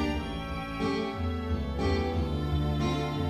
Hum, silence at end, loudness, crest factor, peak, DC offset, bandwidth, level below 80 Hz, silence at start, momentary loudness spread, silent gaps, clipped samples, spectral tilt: none; 0 s; -31 LUFS; 14 dB; -16 dBFS; under 0.1%; 13 kHz; -36 dBFS; 0 s; 5 LU; none; under 0.1%; -7 dB/octave